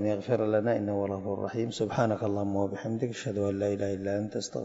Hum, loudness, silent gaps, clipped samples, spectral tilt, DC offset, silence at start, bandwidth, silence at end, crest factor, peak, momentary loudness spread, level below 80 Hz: none; -30 LUFS; none; under 0.1%; -6.5 dB/octave; under 0.1%; 0 s; 8 kHz; 0 s; 18 dB; -12 dBFS; 5 LU; -66 dBFS